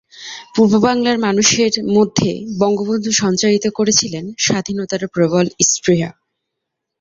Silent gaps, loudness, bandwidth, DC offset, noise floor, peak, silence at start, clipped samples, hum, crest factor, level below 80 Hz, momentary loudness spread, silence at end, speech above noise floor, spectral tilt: none; -15 LUFS; 8 kHz; under 0.1%; -78 dBFS; 0 dBFS; 0.15 s; under 0.1%; none; 16 dB; -52 dBFS; 9 LU; 0.9 s; 63 dB; -3.5 dB/octave